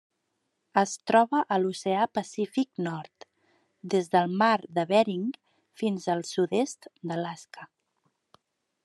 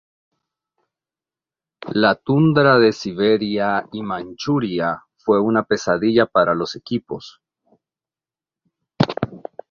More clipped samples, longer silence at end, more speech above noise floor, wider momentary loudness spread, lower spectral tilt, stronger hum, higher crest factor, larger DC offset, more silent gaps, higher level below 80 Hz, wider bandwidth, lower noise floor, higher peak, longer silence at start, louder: neither; first, 1.2 s vs 0.35 s; second, 52 dB vs over 72 dB; first, 16 LU vs 13 LU; second, -5 dB/octave vs -6.5 dB/octave; neither; about the same, 22 dB vs 20 dB; neither; neither; second, -80 dBFS vs -56 dBFS; first, 12 kHz vs 7.4 kHz; second, -78 dBFS vs under -90 dBFS; second, -8 dBFS vs 0 dBFS; second, 0.75 s vs 1.8 s; second, -27 LUFS vs -19 LUFS